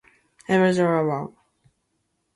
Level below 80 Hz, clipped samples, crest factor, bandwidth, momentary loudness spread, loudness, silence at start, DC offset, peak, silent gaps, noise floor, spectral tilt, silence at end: -66 dBFS; under 0.1%; 18 dB; 11.5 kHz; 19 LU; -22 LUFS; 0.5 s; under 0.1%; -8 dBFS; none; -73 dBFS; -7 dB/octave; 1.05 s